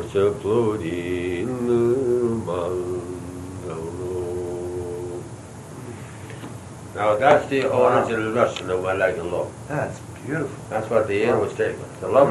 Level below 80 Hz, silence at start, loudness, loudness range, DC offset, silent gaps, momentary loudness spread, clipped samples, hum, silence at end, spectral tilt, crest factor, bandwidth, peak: -52 dBFS; 0 s; -23 LUFS; 10 LU; under 0.1%; none; 18 LU; under 0.1%; none; 0 s; -6.5 dB/octave; 20 dB; 12.5 kHz; -2 dBFS